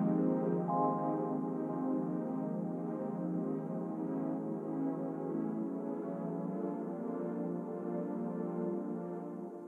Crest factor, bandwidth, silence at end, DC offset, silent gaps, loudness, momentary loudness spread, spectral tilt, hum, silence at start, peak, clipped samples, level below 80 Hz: 16 dB; 3 kHz; 0 s; under 0.1%; none; -37 LUFS; 7 LU; -11.5 dB/octave; none; 0 s; -20 dBFS; under 0.1%; under -90 dBFS